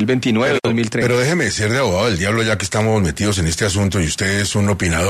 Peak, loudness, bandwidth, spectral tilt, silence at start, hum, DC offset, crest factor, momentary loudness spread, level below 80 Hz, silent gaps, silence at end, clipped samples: -4 dBFS; -17 LUFS; 13.5 kHz; -4.5 dB/octave; 0 s; none; under 0.1%; 12 dB; 2 LU; -36 dBFS; none; 0 s; under 0.1%